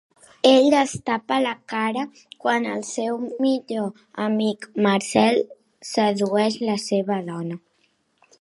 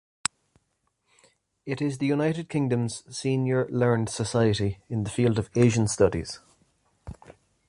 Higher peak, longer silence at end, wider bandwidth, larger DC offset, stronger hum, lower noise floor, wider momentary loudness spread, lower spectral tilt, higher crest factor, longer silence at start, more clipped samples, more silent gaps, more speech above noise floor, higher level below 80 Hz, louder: about the same, -2 dBFS vs -4 dBFS; first, 0.85 s vs 0.35 s; about the same, 11.5 kHz vs 11.5 kHz; neither; neither; second, -66 dBFS vs -74 dBFS; about the same, 12 LU vs 14 LU; second, -4.5 dB/octave vs -6 dB/octave; about the same, 20 dB vs 24 dB; second, 0.45 s vs 1.65 s; neither; neither; second, 45 dB vs 50 dB; second, -66 dBFS vs -50 dBFS; first, -22 LUFS vs -26 LUFS